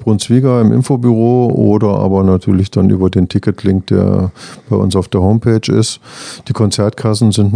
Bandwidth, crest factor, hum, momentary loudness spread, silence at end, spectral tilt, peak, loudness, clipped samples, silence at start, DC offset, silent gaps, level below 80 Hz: 10 kHz; 12 dB; none; 7 LU; 0 s; -7 dB/octave; 0 dBFS; -12 LUFS; 0.2%; 0 s; under 0.1%; none; -42 dBFS